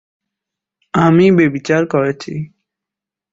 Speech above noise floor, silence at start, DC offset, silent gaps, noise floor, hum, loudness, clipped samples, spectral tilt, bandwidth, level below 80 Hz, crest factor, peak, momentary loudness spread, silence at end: 73 dB; 0.95 s; under 0.1%; none; -86 dBFS; none; -14 LUFS; under 0.1%; -7.5 dB/octave; 7.8 kHz; -52 dBFS; 14 dB; -2 dBFS; 16 LU; 0.85 s